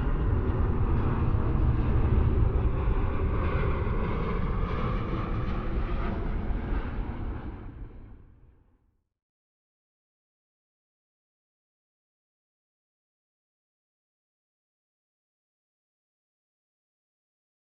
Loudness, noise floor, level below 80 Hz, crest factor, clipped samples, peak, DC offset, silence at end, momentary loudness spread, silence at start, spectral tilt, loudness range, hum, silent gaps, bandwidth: -30 LUFS; -69 dBFS; -32 dBFS; 18 dB; under 0.1%; -12 dBFS; under 0.1%; 9.4 s; 10 LU; 0 s; -10.5 dB/octave; 14 LU; none; none; 4.9 kHz